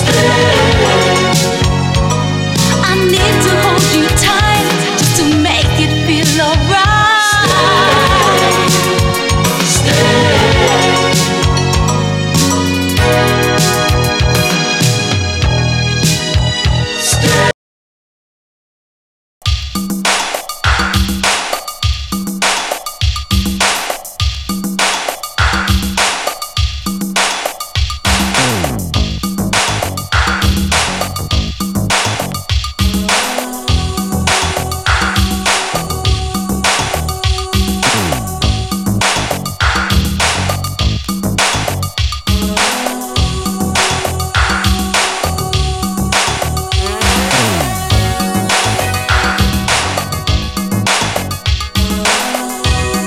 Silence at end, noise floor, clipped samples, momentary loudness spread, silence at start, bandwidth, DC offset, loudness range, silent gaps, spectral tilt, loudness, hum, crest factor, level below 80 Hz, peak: 0 s; under -90 dBFS; under 0.1%; 8 LU; 0 s; 17 kHz; under 0.1%; 5 LU; 17.54-19.41 s; -3.5 dB/octave; -12 LUFS; none; 12 dB; -22 dBFS; 0 dBFS